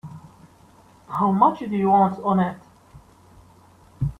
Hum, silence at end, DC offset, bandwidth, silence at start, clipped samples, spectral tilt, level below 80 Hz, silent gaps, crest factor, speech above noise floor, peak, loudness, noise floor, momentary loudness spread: none; 0.05 s; under 0.1%; 6 kHz; 0.05 s; under 0.1%; -9 dB/octave; -50 dBFS; none; 20 dB; 32 dB; -4 dBFS; -21 LUFS; -52 dBFS; 15 LU